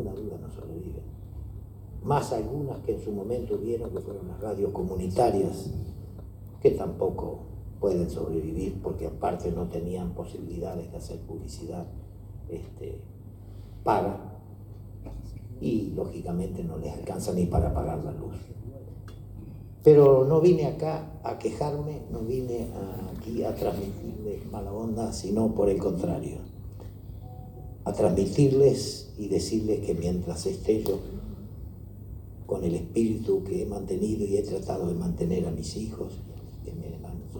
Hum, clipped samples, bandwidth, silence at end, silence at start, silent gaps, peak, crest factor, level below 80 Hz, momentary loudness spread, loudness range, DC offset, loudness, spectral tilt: none; under 0.1%; over 20 kHz; 0 s; 0 s; none; -6 dBFS; 24 dB; -44 dBFS; 18 LU; 11 LU; under 0.1%; -28 LUFS; -7.5 dB/octave